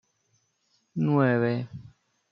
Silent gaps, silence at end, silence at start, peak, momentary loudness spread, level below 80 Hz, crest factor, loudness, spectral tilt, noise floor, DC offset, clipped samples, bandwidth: none; 0.45 s; 0.95 s; -8 dBFS; 18 LU; -70 dBFS; 20 dB; -25 LUFS; -9.5 dB/octave; -72 dBFS; under 0.1%; under 0.1%; 6.6 kHz